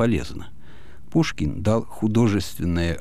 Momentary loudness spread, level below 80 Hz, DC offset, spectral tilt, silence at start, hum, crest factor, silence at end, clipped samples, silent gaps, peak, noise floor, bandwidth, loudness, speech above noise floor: 6 LU; -38 dBFS; 2%; -6.5 dB/octave; 0 s; none; 16 dB; 0 s; under 0.1%; none; -8 dBFS; -47 dBFS; 15.5 kHz; -23 LUFS; 24 dB